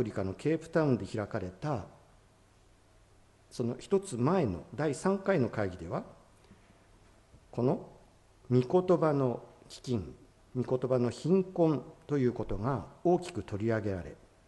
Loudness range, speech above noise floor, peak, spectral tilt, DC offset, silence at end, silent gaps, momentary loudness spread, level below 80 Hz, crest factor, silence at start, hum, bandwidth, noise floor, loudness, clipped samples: 5 LU; 32 dB; -14 dBFS; -7.5 dB/octave; under 0.1%; 0.35 s; none; 12 LU; -56 dBFS; 18 dB; 0 s; none; 11.5 kHz; -62 dBFS; -32 LUFS; under 0.1%